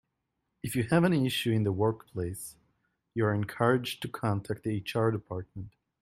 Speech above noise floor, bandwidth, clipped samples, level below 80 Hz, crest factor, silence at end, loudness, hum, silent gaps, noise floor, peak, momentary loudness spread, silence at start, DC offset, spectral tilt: 52 dB; 16 kHz; under 0.1%; -62 dBFS; 20 dB; 0.35 s; -30 LUFS; none; none; -82 dBFS; -10 dBFS; 16 LU; 0.65 s; under 0.1%; -6 dB/octave